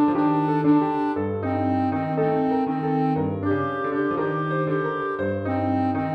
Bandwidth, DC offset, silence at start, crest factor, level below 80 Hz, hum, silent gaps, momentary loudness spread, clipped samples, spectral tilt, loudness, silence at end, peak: 5 kHz; under 0.1%; 0 s; 12 dB; -60 dBFS; none; none; 5 LU; under 0.1%; -10 dB/octave; -23 LUFS; 0 s; -10 dBFS